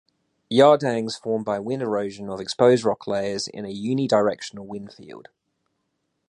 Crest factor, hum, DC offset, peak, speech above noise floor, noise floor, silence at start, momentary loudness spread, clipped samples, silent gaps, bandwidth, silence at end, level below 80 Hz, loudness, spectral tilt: 20 dB; none; under 0.1%; -4 dBFS; 53 dB; -75 dBFS; 0.5 s; 19 LU; under 0.1%; none; 11 kHz; 1.1 s; -64 dBFS; -22 LUFS; -5.5 dB/octave